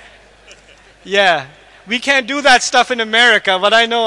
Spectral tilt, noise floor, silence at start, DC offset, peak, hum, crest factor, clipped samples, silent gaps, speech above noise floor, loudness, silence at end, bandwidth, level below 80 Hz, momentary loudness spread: -1.5 dB/octave; -45 dBFS; 1.05 s; under 0.1%; 0 dBFS; none; 14 dB; under 0.1%; none; 32 dB; -12 LUFS; 0 s; 11.5 kHz; -54 dBFS; 8 LU